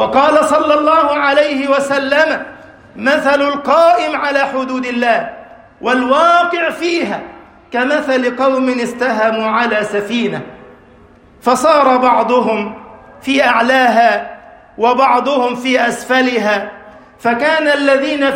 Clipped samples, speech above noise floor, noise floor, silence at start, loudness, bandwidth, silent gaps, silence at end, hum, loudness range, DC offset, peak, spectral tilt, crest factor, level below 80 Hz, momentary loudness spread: under 0.1%; 31 dB; -43 dBFS; 0 s; -13 LUFS; 16.5 kHz; none; 0 s; none; 3 LU; under 0.1%; 0 dBFS; -4 dB/octave; 14 dB; -54 dBFS; 10 LU